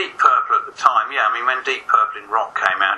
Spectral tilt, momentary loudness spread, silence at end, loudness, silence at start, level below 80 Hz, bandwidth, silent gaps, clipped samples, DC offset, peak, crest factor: -0.5 dB/octave; 6 LU; 0 s; -17 LUFS; 0 s; -66 dBFS; 11 kHz; none; under 0.1%; under 0.1%; 0 dBFS; 18 dB